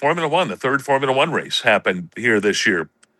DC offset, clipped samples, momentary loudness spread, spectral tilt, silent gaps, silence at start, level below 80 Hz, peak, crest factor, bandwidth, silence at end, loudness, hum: under 0.1%; under 0.1%; 5 LU; -4 dB/octave; none; 0 s; -70 dBFS; -2 dBFS; 18 dB; 12.5 kHz; 0.35 s; -18 LUFS; none